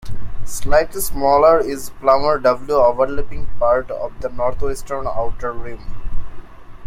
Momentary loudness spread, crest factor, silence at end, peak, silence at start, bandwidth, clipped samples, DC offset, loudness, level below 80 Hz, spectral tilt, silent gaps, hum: 20 LU; 14 dB; 0 s; -2 dBFS; 0.05 s; 16 kHz; under 0.1%; under 0.1%; -18 LUFS; -30 dBFS; -4.5 dB/octave; none; none